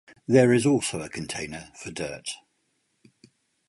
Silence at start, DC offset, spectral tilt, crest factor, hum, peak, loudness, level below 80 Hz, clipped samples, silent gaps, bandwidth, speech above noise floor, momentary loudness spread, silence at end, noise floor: 0.3 s; under 0.1%; -5 dB/octave; 20 dB; none; -6 dBFS; -24 LUFS; -58 dBFS; under 0.1%; none; 11.5 kHz; 49 dB; 18 LU; 1.35 s; -73 dBFS